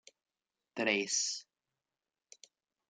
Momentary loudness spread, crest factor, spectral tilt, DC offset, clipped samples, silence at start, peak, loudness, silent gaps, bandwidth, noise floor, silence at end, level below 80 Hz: 13 LU; 24 dB; -1 dB/octave; under 0.1%; under 0.1%; 0.75 s; -16 dBFS; -33 LUFS; none; 11 kHz; under -90 dBFS; 1.45 s; -88 dBFS